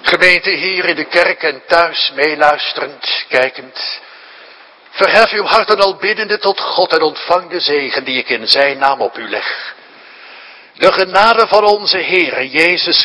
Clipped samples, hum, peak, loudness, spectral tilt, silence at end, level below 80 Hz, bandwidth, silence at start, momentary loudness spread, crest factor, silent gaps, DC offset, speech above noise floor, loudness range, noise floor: 0.4%; none; 0 dBFS; -12 LUFS; -3 dB/octave; 0 s; -52 dBFS; 11 kHz; 0 s; 10 LU; 14 dB; none; under 0.1%; 27 dB; 3 LU; -40 dBFS